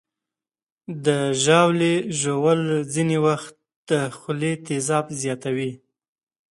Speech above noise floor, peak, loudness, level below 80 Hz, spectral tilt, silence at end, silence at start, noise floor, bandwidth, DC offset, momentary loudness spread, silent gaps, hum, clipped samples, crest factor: over 69 dB; -2 dBFS; -22 LUFS; -66 dBFS; -5 dB/octave; 0.75 s; 0.9 s; under -90 dBFS; 11.5 kHz; under 0.1%; 11 LU; 3.76-3.83 s; none; under 0.1%; 20 dB